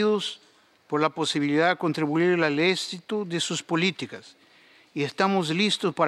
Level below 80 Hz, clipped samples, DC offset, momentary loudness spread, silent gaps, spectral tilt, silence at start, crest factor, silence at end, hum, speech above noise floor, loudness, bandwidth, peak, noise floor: -76 dBFS; under 0.1%; under 0.1%; 11 LU; none; -4.5 dB/octave; 0 s; 18 dB; 0 s; none; 32 dB; -25 LUFS; 13.5 kHz; -6 dBFS; -56 dBFS